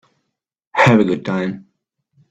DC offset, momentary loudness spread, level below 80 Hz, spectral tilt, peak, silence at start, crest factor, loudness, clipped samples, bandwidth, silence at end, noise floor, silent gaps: under 0.1%; 14 LU; -58 dBFS; -7 dB/octave; 0 dBFS; 0.75 s; 18 dB; -16 LUFS; under 0.1%; 8.8 kHz; 0.7 s; -75 dBFS; none